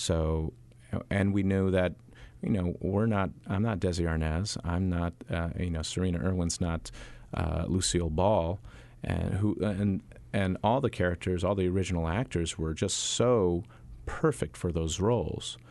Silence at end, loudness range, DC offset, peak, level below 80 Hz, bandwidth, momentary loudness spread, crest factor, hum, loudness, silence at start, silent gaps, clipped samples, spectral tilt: 0.05 s; 2 LU; under 0.1%; -12 dBFS; -44 dBFS; 12 kHz; 10 LU; 18 dB; none; -30 LUFS; 0 s; none; under 0.1%; -5.5 dB/octave